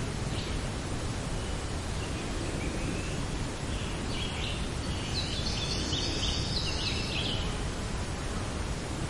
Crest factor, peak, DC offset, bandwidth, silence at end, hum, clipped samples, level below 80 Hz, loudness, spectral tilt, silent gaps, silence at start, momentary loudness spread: 16 dB; -16 dBFS; under 0.1%; 11.5 kHz; 0 s; none; under 0.1%; -38 dBFS; -33 LUFS; -4 dB/octave; none; 0 s; 5 LU